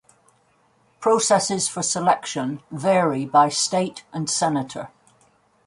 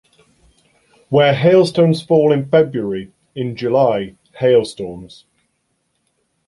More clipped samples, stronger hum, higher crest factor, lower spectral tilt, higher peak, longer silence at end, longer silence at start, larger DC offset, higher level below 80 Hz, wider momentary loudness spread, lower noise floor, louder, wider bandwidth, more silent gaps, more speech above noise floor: neither; neither; about the same, 18 dB vs 16 dB; second, -3.5 dB/octave vs -7 dB/octave; second, -4 dBFS vs 0 dBFS; second, 0.8 s vs 1.4 s; about the same, 1 s vs 1.1 s; neither; second, -66 dBFS vs -56 dBFS; second, 11 LU vs 17 LU; second, -62 dBFS vs -68 dBFS; second, -21 LUFS vs -15 LUFS; about the same, 11.5 kHz vs 11.5 kHz; neither; second, 40 dB vs 53 dB